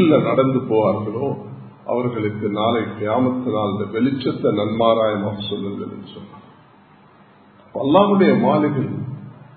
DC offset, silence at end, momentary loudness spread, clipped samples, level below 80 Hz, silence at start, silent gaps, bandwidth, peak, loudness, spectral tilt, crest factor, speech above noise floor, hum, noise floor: under 0.1%; 0.25 s; 17 LU; under 0.1%; -56 dBFS; 0 s; none; 4.5 kHz; 0 dBFS; -19 LUFS; -12 dB/octave; 18 dB; 30 dB; none; -49 dBFS